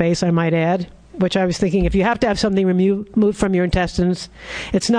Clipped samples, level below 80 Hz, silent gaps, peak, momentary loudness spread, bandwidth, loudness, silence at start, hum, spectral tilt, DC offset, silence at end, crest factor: under 0.1%; -34 dBFS; none; -2 dBFS; 6 LU; 10 kHz; -18 LUFS; 0 s; none; -6 dB/octave; under 0.1%; 0 s; 14 dB